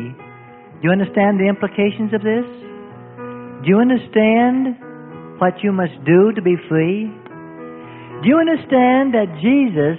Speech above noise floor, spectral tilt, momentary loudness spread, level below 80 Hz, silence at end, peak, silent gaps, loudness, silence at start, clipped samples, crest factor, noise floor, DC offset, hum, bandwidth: 25 dB; -12.5 dB/octave; 22 LU; -58 dBFS; 0 s; -2 dBFS; none; -16 LUFS; 0 s; under 0.1%; 16 dB; -40 dBFS; under 0.1%; none; 4 kHz